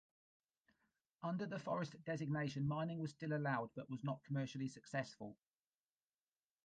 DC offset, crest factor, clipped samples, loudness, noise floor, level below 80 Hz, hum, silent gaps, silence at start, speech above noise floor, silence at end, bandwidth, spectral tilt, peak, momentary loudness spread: under 0.1%; 18 dB; under 0.1%; -44 LUFS; under -90 dBFS; -80 dBFS; none; none; 1.2 s; over 47 dB; 1.3 s; 9.2 kHz; -7 dB/octave; -28 dBFS; 7 LU